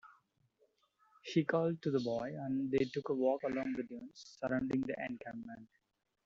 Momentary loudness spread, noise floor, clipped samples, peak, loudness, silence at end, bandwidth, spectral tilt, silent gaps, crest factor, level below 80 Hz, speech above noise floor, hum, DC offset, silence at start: 15 LU; -76 dBFS; under 0.1%; -18 dBFS; -37 LUFS; 0.6 s; 7.6 kHz; -6 dB/octave; none; 20 dB; -72 dBFS; 39 dB; none; under 0.1%; 0.05 s